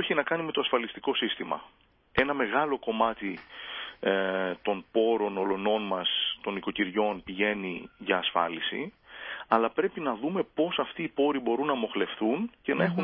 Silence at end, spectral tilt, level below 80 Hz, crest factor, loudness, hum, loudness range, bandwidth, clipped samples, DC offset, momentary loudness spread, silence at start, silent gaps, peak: 0 s; -9 dB/octave; -64 dBFS; 22 dB; -29 LUFS; none; 1 LU; 5.4 kHz; under 0.1%; under 0.1%; 10 LU; 0 s; none; -6 dBFS